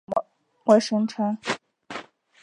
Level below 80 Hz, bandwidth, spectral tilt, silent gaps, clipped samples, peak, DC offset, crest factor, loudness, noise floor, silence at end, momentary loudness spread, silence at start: -72 dBFS; 10.5 kHz; -5 dB/octave; none; under 0.1%; -4 dBFS; under 0.1%; 22 dB; -24 LUFS; -41 dBFS; 0.4 s; 19 LU; 0.1 s